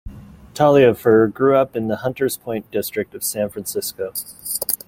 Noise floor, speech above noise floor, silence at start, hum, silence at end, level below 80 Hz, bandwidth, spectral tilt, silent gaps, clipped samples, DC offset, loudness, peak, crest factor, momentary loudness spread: -37 dBFS; 19 dB; 0.05 s; none; 0.15 s; -48 dBFS; 17 kHz; -5 dB/octave; none; under 0.1%; under 0.1%; -19 LUFS; 0 dBFS; 20 dB; 13 LU